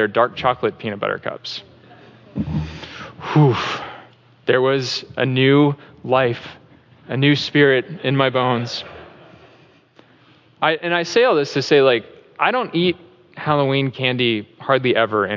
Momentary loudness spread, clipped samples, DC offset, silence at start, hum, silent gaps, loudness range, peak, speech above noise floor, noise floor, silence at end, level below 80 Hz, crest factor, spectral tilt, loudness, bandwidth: 15 LU; under 0.1%; under 0.1%; 0 s; none; none; 5 LU; -2 dBFS; 34 dB; -52 dBFS; 0 s; -50 dBFS; 16 dB; -6 dB/octave; -18 LUFS; 7.6 kHz